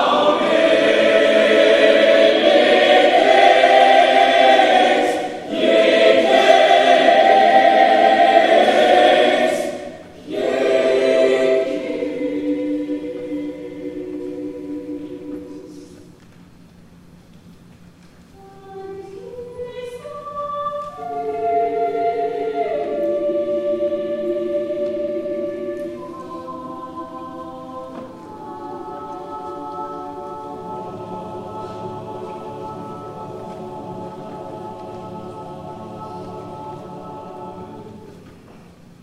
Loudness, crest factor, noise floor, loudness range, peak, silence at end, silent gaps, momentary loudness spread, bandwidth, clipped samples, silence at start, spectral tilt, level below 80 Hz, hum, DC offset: -15 LUFS; 18 dB; -45 dBFS; 21 LU; 0 dBFS; 0.45 s; none; 21 LU; 12 kHz; under 0.1%; 0 s; -4 dB/octave; -58 dBFS; none; under 0.1%